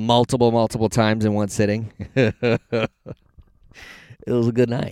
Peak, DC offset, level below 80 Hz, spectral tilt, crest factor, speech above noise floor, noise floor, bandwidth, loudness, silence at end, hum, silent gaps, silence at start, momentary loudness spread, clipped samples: -2 dBFS; under 0.1%; -48 dBFS; -6 dB/octave; 20 dB; 31 dB; -51 dBFS; 14 kHz; -20 LUFS; 0 s; none; none; 0 s; 23 LU; under 0.1%